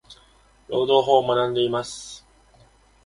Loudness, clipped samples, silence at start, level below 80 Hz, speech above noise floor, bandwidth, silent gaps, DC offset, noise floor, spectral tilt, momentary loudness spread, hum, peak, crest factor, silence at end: -21 LUFS; under 0.1%; 0.1 s; -58 dBFS; 35 dB; 11.5 kHz; none; under 0.1%; -56 dBFS; -4.5 dB/octave; 19 LU; none; -4 dBFS; 20 dB; 0.85 s